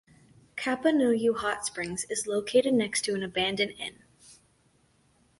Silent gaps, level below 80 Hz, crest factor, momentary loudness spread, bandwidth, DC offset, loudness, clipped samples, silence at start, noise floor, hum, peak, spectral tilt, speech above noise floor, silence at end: none; -64 dBFS; 18 dB; 9 LU; 11.5 kHz; under 0.1%; -28 LUFS; under 0.1%; 0.55 s; -66 dBFS; none; -12 dBFS; -3 dB/octave; 39 dB; 1.05 s